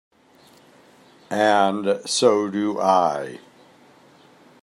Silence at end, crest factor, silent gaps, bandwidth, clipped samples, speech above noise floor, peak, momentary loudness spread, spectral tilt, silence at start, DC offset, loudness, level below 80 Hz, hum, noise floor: 1.25 s; 20 dB; none; 13.5 kHz; under 0.1%; 34 dB; -4 dBFS; 12 LU; -4 dB/octave; 1.3 s; under 0.1%; -20 LUFS; -76 dBFS; none; -53 dBFS